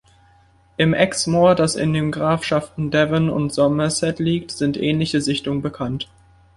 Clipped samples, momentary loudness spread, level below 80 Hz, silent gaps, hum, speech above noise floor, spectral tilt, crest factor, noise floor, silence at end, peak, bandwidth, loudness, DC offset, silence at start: under 0.1%; 9 LU; -48 dBFS; none; none; 35 dB; -5.5 dB/octave; 18 dB; -54 dBFS; 0.55 s; -2 dBFS; 11.5 kHz; -19 LUFS; under 0.1%; 0.8 s